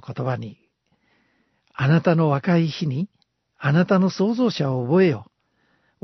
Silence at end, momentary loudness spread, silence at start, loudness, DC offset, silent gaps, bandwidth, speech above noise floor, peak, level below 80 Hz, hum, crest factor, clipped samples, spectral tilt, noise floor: 0.8 s; 13 LU; 0.05 s; -21 LUFS; under 0.1%; none; 6.2 kHz; 47 dB; -4 dBFS; -64 dBFS; none; 18 dB; under 0.1%; -8 dB/octave; -67 dBFS